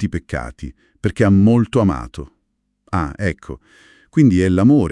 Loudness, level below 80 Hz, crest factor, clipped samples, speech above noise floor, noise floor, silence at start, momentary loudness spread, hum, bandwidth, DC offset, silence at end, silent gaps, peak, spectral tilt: -17 LUFS; -38 dBFS; 16 dB; under 0.1%; 53 dB; -69 dBFS; 0 s; 22 LU; none; 11 kHz; under 0.1%; 0 s; none; -2 dBFS; -8 dB/octave